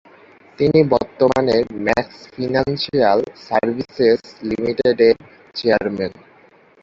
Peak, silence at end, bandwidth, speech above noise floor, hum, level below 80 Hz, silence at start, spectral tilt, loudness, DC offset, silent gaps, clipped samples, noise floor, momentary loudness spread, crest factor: -2 dBFS; 0.7 s; 7.4 kHz; 33 dB; none; -50 dBFS; 0.6 s; -7 dB/octave; -18 LUFS; under 0.1%; none; under 0.1%; -50 dBFS; 9 LU; 16 dB